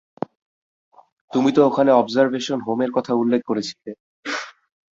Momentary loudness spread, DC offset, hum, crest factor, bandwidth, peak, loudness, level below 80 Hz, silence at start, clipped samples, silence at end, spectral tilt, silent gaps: 17 LU; under 0.1%; none; 18 dB; 7.8 kHz; -2 dBFS; -20 LUFS; -66 dBFS; 1.3 s; under 0.1%; 0.45 s; -5.5 dB/octave; 4.00-4.23 s